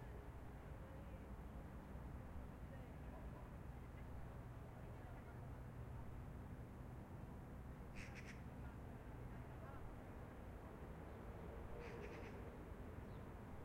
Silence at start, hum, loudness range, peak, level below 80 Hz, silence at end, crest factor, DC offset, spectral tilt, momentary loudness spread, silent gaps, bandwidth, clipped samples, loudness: 0 s; none; 1 LU; -40 dBFS; -58 dBFS; 0 s; 14 dB; under 0.1%; -7.5 dB/octave; 2 LU; none; 16 kHz; under 0.1%; -56 LUFS